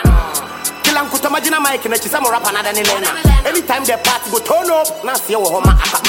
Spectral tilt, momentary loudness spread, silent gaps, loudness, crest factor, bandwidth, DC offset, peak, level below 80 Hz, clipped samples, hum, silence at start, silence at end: -3.5 dB/octave; 4 LU; none; -14 LUFS; 14 dB; 17 kHz; under 0.1%; 0 dBFS; -20 dBFS; under 0.1%; none; 0 s; 0 s